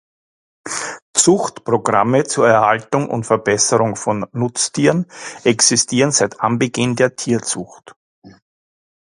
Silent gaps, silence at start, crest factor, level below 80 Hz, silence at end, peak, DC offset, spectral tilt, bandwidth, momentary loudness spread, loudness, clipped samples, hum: 1.02-1.14 s, 7.96-8.22 s; 0.65 s; 18 dB; -56 dBFS; 0.7 s; 0 dBFS; under 0.1%; -3.5 dB/octave; 11.5 kHz; 11 LU; -16 LUFS; under 0.1%; none